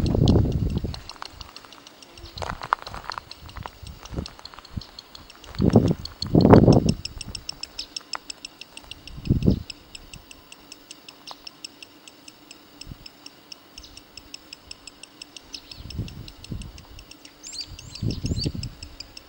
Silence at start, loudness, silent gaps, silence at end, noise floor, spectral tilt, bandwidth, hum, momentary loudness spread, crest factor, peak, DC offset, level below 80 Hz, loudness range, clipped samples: 0 s; -24 LUFS; none; 0.25 s; -48 dBFS; -6.5 dB/octave; 16.5 kHz; none; 24 LU; 26 dB; 0 dBFS; under 0.1%; -38 dBFS; 21 LU; under 0.1%